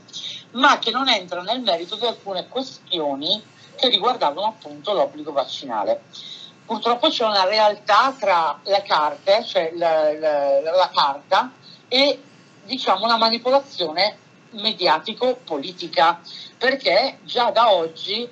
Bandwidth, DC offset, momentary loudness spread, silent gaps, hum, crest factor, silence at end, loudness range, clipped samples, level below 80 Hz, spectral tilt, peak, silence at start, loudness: 8.2 kHz; under 0.1%; 12 LU; none; none; 18 dB; 0 s; 4 LU; under 0.1%; -86 dBFS; -3 dB/octave; -2 dBFS; 0.15 s; -20 LUFS